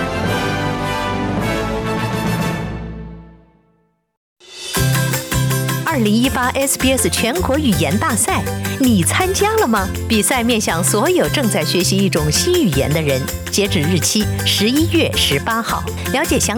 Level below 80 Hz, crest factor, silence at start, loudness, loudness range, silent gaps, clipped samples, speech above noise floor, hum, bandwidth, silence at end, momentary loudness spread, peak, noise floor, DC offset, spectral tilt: -34 dBFS; 14 dB; 0 s; -16 LUFS; 7 LU; 4.17-4.36 s; under 0.1%; 45 dB; none; over 20 kHz; 0 s; 6 LU; -4 dBFS; -61 dBFS; under 0.1%; -4 dB/octave